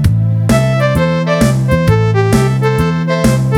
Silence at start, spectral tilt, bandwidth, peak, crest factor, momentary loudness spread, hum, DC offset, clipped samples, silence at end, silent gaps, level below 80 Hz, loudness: 0 s; -7 dB/octave; 16 kHz; 0 dBFS; 10 dB; 2 LU; none; under 0.1%; under 0.1%; 0 s; none; -26 dBFS; -12 LUFS